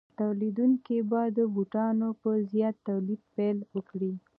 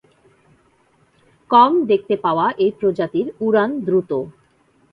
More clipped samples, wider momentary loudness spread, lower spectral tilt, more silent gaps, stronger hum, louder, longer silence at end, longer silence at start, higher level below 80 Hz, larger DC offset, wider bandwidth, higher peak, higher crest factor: neither; about the same, 7 LU vs 9 LU; first, -12 dB/octave vs -8.5 dB/octave; neither; neither; second, -29 LUFS vs -18 LUFS; second, 0.2 s vs 0.6 s; second, 0.2 s vs 1.5 s; second, -80 dBFS vs -62 dBFS; neither; second, 3.5 kHz vs 5.2 kHz; second, -16 dBFS vs 0 dBFS; second, 14 dB vs 20 dB